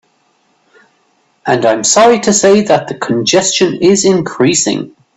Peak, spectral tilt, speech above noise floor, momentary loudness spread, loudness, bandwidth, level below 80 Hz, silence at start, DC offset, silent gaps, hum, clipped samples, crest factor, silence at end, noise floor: 0 dBFS; -3.5 dB/octave; 46 dB; 8 LU; -10 LUFS; 8.6 kHz; -52 dBFS; 1.45 s; under 0.1%; none; none; under 0.1%; 12 dB; 0.3 s; -56 dBFS